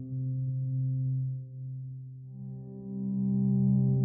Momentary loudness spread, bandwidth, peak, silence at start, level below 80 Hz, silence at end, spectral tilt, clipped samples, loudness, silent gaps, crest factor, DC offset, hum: 16 LU; 1 kHz; -18 dBFS; 0 s; -64 dBFS; 0 s; -15 dB/octave; under 0.1%; -31 LUFS; none; 12 dB; under 0.1%; none